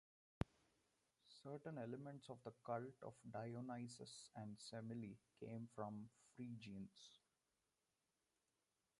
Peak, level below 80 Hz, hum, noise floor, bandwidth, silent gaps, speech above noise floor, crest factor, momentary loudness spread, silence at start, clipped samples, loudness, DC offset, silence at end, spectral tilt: -26 dBFS; -72 dBFS; none; under -90 dBFS; 11 kHz; none; over 36 dB; 30 dB; 9 LU; 0.4 s; under 0.1%; -55 LUFS; under 0.1%; 1.85 s; -6 dB/octave